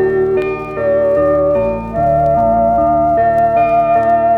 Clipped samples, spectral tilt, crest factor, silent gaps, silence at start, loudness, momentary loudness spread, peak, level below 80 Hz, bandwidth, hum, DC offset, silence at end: under 0.1%; -9.5 dB/octave; 10 dB; none; 0 s; -13 LUFS; 5 LU; -4 dBFS; -34 dBFS; 4.5 kHz; none; under 0.1%; 0 s